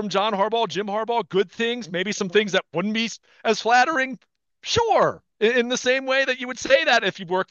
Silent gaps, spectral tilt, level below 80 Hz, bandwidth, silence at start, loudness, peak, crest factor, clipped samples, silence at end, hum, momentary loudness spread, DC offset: none; -3.5 dB/octave; -60 dBFS; 8.2 kHz; 0 s; -22 LUFS; -4 dBFS; 20 dB; under 0.1%; 0.05 s; none; 8 LU; under 0.1%